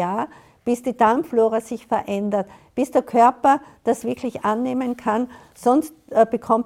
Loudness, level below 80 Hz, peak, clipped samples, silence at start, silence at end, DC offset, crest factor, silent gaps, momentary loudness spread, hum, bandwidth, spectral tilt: -21 LUFS; -60 dBFS; -4 dBFS; under 0.1%; 0 s; 0 s; under 0.1%; 18 dB; none; 9 LU; none; 16 kHz; -6 dB/octave